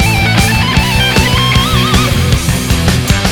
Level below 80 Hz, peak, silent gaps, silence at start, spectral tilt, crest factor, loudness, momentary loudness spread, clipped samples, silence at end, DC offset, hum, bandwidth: -18 dBFS; 0 dBFS; none; 0 s; -4 dB/octave; 10 dB; -10 LUFS; 3 LU; 0.1%; 0 s; under 0.1%; none; 20 kHz